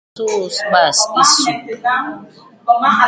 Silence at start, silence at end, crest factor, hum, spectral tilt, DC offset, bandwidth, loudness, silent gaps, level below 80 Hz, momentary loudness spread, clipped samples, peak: 0.15 s; 0 s; 16 dB; none; -1 dB/octave; under 0.1%; 9.6 kHz; -14 LUFS; none; -62 dBFS; 12 LU; under 0.1%; 0 dBFS